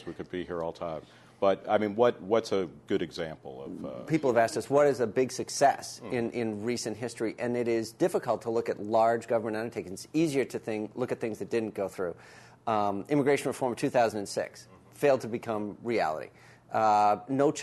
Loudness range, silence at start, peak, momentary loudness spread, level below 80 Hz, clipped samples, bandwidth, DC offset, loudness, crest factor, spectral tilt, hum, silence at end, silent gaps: 3 LU; 0 s; -10 dBFS; 12 LU; -68 dBFS; under 0.1%; 12.5 kHz; under 0.1%; -29 LUFS; 20 dB; -5 dB/octave; none; 0 s; none